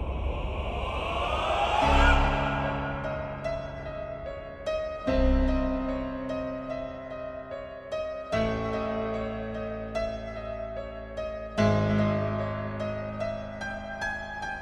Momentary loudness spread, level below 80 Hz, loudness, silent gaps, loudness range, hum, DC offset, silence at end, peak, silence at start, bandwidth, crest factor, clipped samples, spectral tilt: 12 LU; -34 dBFS; -30 LUFS; none; 6 LU; none; under 0.1%; 0 s; -8 dBFS; 0 s; 9.4 kHz; 20 dB; under 0.1%; -6.5 dB/octave